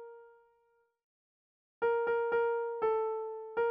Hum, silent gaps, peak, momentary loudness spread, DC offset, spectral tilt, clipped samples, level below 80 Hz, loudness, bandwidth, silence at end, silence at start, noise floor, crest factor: none; 1.04-1.81 s; -22 dBFS; 8 LU; under 0.1%; -2 dB/octave; under 0.1%; -74 dBFS; -33 LUFS; 3.5 kHz; 0 s; 0 s; -73 dBFS; 14 dB